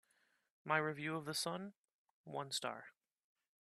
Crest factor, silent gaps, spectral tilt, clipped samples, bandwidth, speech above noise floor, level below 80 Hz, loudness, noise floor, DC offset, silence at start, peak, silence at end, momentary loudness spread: 26 dB; 1.77-1.84 s, 1.94-2.24 s; -3.5 dB/octave; under 0.1%; 13 kHz; 37 dB; -86 dBFS; -41 LUFS; -79 dBFS; under 0.1%; 0.65 s; -20 dBFS; 0.7 s; 16 LU